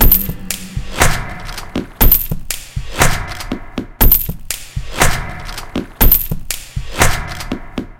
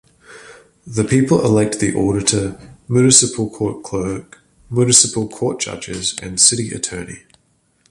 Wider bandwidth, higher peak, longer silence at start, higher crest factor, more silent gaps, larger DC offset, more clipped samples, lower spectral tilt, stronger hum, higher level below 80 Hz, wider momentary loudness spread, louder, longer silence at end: first, 18.5 kHz vs 15 kHz; about the same, 0 dBFS vs 0 dBFS; second, 0 s vs 0.3 s; about the same, 16 dB vs 18 dB; neither; neither; first, 0.2% vs under 0.1%; about the same, -3.5 dB/octave vs -3.5 dB/octave; neither; first, -20 dBFS vs -46 dBFS; about the same, 15 LU vs 14 LU; about the same, -16 LUFS vs -16 LUFS; second, 0.05 s vs 0.75 s